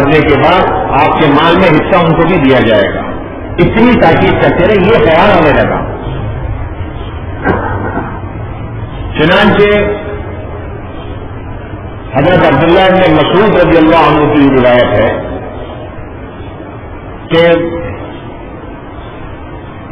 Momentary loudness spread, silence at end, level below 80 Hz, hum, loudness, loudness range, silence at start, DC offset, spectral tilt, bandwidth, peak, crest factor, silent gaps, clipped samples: 19 LU; 0 s; -26 dBFS; none; -8 LUFS; 8 LU; 0 s; under 0.1%; -9 dB/octave; 5.4 kHz; 0 dBFS; 10 dB; none; 1%